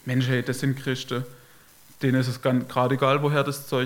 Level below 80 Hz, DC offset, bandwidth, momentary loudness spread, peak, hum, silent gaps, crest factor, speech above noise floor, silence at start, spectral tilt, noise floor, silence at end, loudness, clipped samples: -66 dBFS; under 0.1%; 17 kHz; 8 LU; -6 dBFS; none; none; 18 dB; 28 dB; 0.05 s; -6 dB/octave; -52 dBFS; 0 s; -25 LUFS; under 0.1%